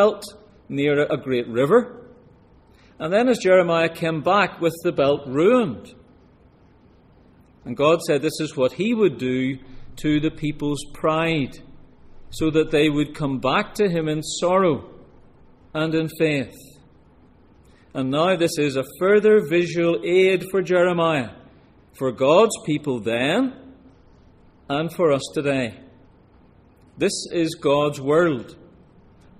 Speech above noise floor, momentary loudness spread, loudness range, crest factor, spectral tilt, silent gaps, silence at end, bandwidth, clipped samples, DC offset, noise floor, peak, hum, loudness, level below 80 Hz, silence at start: 33 dB; 11 LU; 6 LU; 18 dB; -5.5 dB/octave; none; 0.85 s; 15.5 kHz; under 0.1%; under 0.1%; -53 dBFS; -4 dBFS; none; -21 LUFS; -50 dBFS; 0 s